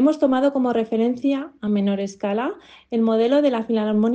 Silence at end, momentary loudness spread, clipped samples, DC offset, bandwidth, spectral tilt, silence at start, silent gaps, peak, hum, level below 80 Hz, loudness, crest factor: 0 s; 8 LU; under 0.1%; under 0.1%; 8.4 kHz; -7 dB/octave; 0 s; none; -6 dBFS; none; -64 dBFS; -21 LUFS; 14 dB